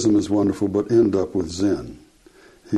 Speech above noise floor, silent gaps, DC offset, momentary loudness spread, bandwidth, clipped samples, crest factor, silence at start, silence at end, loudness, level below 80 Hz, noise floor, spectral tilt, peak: 31 dB; none; under 0.1%; 8 LU; 11.5 kHz; under 0.1%; 14 dB; 0 s; 0 s; -21 LUFS; -50 dBFS; -51 dBFS; -6.5 dB/octave; -6 dBFS